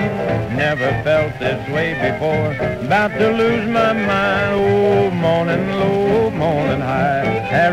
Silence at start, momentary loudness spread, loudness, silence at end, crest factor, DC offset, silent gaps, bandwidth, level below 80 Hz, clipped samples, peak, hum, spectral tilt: 0 s; 5 LU; -17 LUFS; 0 s; 14 dB; under 0.1%; none; 15 kHz; -40 dBFS; under 0.1%; -2 dBFS; none; -7 dB/octave